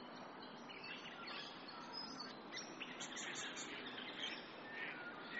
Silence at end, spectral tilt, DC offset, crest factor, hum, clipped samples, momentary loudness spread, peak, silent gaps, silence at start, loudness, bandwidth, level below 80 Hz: 0 s; -0.5 dB/octave; under 0.1%; 18 dB; none; under 0.1%; 6 LU; -34 dBFS; none; 0 s; -49 LUFS; 8 kHz; -86 dBFS